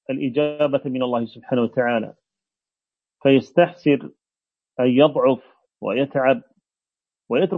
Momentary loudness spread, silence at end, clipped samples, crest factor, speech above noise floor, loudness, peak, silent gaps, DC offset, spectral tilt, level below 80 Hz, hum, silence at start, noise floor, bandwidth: 9 LU; 0 s; under 0.1%; 20 dB; over 71 dB; -20 LUFS; -2 dBFS; none; under 0.1%; -8.5 dB/octave; -70 dBFS; none; 0.1 s; under -90 dBFS; 6.4 kHz